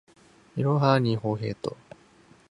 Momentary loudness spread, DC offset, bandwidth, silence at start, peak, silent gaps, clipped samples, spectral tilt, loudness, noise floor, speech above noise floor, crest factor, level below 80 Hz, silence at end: 15 LU; under 0.1%; 10.5 kHz; 0.55 s; -6 dBFS; none; under 0.1%; -8 dB/octave; -26 LUFS; -57 dBFS; 32 dB; 22 dB; -62 dBFS; 0.8 s